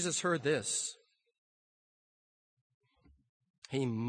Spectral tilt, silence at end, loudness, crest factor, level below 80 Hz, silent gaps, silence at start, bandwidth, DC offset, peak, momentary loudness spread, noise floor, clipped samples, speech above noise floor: -3.5 dB/octave; 0 s; -34 LUFS; 20 dB; -76 dBFS; 1.38-2.81 s, 3.29-3.40 s, 3.50-3.62 s; 0 s; 10 kHz; under 0.1%; -18 dBFS; 8 LU; under -90 dBFS; under 0.1%; over 56 dB